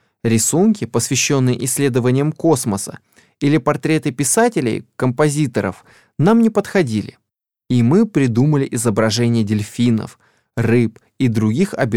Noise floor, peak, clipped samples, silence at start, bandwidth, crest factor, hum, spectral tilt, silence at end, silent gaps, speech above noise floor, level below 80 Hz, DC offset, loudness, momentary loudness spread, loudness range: -78 dBFS; -2 dBFS; under 0.1%; 0.25 s; 17 kHz; 14 dB; none; -5.5 dB/octave; 0 s; none; 62 dB; -52 dBFS; under 0.1%; -17 LUFS; 8 LU; 1 LU